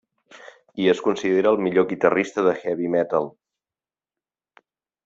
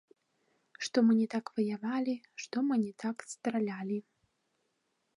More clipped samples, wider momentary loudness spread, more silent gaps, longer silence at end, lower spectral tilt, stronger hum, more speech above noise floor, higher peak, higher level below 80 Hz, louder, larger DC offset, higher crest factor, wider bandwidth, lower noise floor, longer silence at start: neither; second, 6 LU vs 12 LU; neither; first, 1.75 s vs 1.15 s; about the same, -6 dB/octave vs -5.5 dB/octave; neither; first, over 69 dB vs 48 dB; first, -2 dBFS vs -16 dBFS; first, -64 dBFS vs -86 dBFS; first, -21 LUFS vs -33 LUFS; neither; about the same, 22 dB vs 18 dB; second, 7.8 kHz vs 11 kHz; first, under -90 dBFS vs -80 dBFS; second, 0.35 s vs 0.8 s